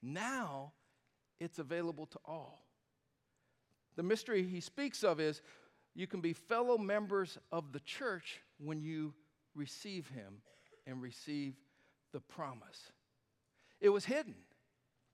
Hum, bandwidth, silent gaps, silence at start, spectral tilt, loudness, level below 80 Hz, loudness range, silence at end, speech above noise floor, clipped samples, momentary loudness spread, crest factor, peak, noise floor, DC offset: none; 14 kHz; none; 0 s; -5 dB/octave; -40 LUFS; under -90 dBFS; 10 LU; 0.75 s; 43 dB; under 0.1%; 18 LU; 22 dB; -18 dBFS; -83 dBFS; under 0.1%